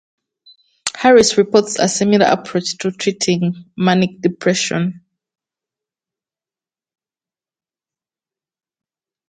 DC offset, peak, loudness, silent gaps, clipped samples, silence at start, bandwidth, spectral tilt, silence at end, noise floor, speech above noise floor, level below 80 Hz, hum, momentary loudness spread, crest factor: under 0.1%; 0 dBFS; -16 LUFS; none; under 0.1%; 0.85 s; 9.8 kHz; -4.5 dB/octave; 4.3 s; under -90 dBFS; over 75 dB; -58 dBFS; none; 11 LU; 18 dB